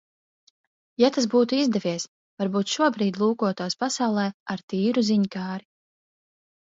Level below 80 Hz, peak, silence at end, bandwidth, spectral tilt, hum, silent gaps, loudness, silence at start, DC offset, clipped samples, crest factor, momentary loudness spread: -72 dBFS; -6 dBFS; 1.15 s; 7.8 kHz; -5 dB/octave; none; 2.08-2.37 s, 4.34-4.46 s, 4.63-4.68 s; -24 LUFS; 1 s; under 0.1%; under 0.1%; 18 dB; 11 LU